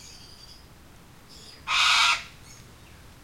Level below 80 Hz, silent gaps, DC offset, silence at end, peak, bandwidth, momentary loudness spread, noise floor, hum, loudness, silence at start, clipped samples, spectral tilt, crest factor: -56 dBFS; none; 0.1%; 0.7 s; -8 dBFS; 16.5 kHz; 27 LU; -51 dBFS; none; -21 LUFS; 0.05 s; under 0.1%; 1 dB/octave; 20 dB